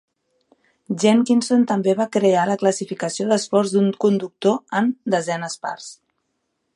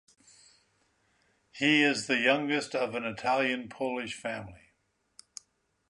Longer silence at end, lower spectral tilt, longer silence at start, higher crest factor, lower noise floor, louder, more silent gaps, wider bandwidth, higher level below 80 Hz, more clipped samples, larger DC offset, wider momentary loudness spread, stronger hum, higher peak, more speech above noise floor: second, 0.85 s vs 1.35 s; first, -5 dB/octave vs -3.5 dB/octave; second, 0.9 s vs 1.55 s; about the same, 18 dB vs 22 dB; about the same, -73 dBFS vs -75 dBFS; first, -20 LUFS vs -28 LUFS; neither; about the same, 11.5 kHz vs 11.5 kHz; about the same, -72 dBFS vs -70 dBFS; neither; neither; second, 11 LU vs 24 LU; neither; first, -4 dBFS vs -10 dBFS; first, 54 dB vs 45 dB